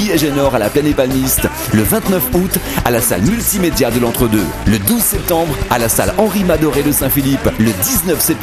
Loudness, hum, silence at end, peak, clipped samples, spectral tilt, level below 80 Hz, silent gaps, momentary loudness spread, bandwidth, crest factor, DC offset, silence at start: -13 LUFS; none; 0 s; 0 dBFS; under 0.1%; -4.5 dB/octave; -28 dBFS; none; 3 LU; 14.5 kHz; 14 dB; under 0.1%; 0 s